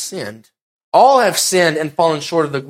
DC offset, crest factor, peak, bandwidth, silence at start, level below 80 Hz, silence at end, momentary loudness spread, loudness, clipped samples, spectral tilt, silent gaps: under 0.1%; 16 dB; 0 dBFS; 16.5 kHz; 0 s; -64 dBFS; 0 s; 14 LU; -14 LUFS; under 0.1%; -3 dB/octave; 0.62-0.92 s